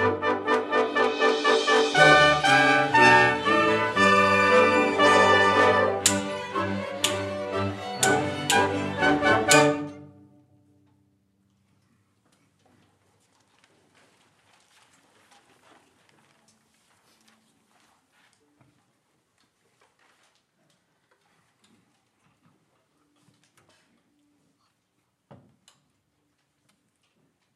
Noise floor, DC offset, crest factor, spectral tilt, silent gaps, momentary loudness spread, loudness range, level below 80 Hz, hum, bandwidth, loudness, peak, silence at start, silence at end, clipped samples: -74 dBFS; under 0.1%; 24 dB; -3 dB/octave; none; 13 LU; 7 LU; -60 dBFS; none; 15 kHz; -20 LUFS; 0 dBFS; 0 s; 17.5 s; under 0.1%